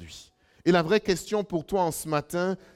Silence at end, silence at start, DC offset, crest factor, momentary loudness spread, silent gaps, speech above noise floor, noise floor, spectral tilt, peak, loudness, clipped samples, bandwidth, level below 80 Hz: 0.2 s; 0 s; under 0.1%; 18 dB; 7 LU; none; 26 dB; -52 dBFS; -5 dB/octave; -8 dBFS; -26 LUFS; under 0.1%; 16 kHz; -56 dBFS